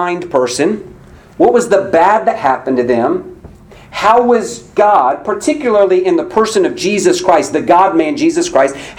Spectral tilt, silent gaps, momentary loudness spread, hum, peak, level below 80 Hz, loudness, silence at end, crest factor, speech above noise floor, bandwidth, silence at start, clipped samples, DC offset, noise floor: -4.5 dB/octave; none; 6 LU; none; 0 dBFS; -46 dBFS; -12 LUFS; 0.05 s; 12 dB; 25 dB; 15.5 kHz; 0 s; 0.1%; under 0.1%; -36 dBFS